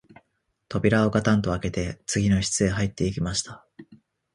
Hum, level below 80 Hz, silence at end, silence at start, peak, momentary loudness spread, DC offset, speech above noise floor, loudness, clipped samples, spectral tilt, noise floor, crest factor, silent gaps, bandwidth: none; -42 dBFS; 0.4 s; 0.7 s; -6 dBFS; 8 LU; under 0.1%; 50 dB; -24 LUFS; under 0.1%; -5 dB/octave; -74 dBFS; 20 dB; none; 11.5 kHz